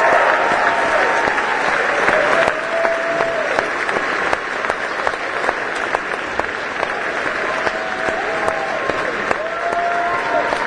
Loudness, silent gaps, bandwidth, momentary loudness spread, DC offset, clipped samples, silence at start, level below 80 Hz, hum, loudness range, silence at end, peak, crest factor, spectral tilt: -18 LUFS; none; 10.5 kHz; 6 LU; under 0.1%; under 0.1%; 0 s; -48 dBFS; none; 4 LU; 0 s; 0 dBFS; 18 dB; -3 dB/octave